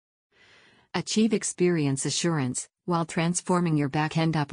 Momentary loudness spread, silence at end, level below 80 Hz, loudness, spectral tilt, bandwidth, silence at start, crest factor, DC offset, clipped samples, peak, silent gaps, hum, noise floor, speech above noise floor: 6 LU; 0 s; -64 dBFS; -26 LUFS; -5 dB/octave; 10 kHz; 0.95 s; 16 dB; under 0.1%; under 0.1%; -10 dBFS; none; none; -58 dBFS; 33 dB